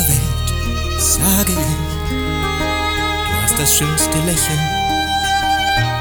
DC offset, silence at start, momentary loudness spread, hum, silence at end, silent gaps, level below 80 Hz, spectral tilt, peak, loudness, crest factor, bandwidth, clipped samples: under 0.1%; 0 s; 7 LU; none; 0 s; none; -26 dBFS; -3 dB/octave; 0 dBFS; -16 LUFS; 16 dB; over 20 kHz; under 0.1%